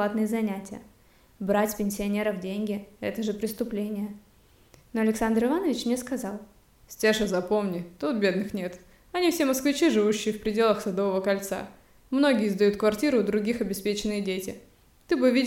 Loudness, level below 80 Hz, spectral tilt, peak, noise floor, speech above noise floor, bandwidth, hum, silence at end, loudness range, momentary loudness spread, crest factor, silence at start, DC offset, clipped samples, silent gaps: -27 LUFS; -56 dBFS; -5 dB/octave; -10 dBFS; -57 dBFS; 31 dB; 17 kHz; none; 0 s; 5 LU; 12 LU; 18 dB; 0 s; under 0.1%; under 0.1%; none